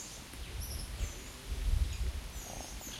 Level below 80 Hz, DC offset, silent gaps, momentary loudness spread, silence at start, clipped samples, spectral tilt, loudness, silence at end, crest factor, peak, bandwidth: -40 dBFS; under 0.1%; none; 9 LU; 0 s; under 0.1%; -3.5 dB/octave; -41 LUFS; 0 s; 18 dB; -20 dBFS; 16 kHz